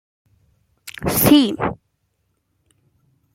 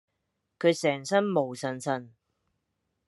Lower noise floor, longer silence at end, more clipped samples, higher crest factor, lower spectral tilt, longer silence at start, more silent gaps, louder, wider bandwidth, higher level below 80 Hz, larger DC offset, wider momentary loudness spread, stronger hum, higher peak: second, -69 dBFS vs -80 dBFS; first, 1.6 s vs 1 s; neither; about the same, 20 dB vs 20 dB; about the same, -4.5 dB/octave vs -5 dB/octave; first, 0.85 s vs 0.6 s; neither; first, -17 LUFS vs -28 LUFS; first, 16.5 kHz vs 12 kHz; first, -46 dBFS vs -78 dBFS; neither; first, 26 LU vs 8 LU; neither; first, 0 dBFS vs -10 dBFS